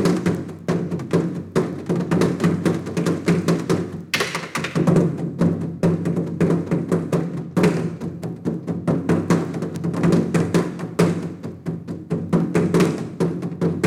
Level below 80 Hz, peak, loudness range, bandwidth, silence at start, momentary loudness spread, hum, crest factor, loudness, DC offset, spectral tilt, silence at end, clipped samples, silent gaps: -52 dBFS; -6 dBFS; 1 LU; 14 kHz; 0 s; 8 LU; none; 16 dB; -22 LUFS; under 0.1%; -7 dB/octave; 0 s; under 0.1%; none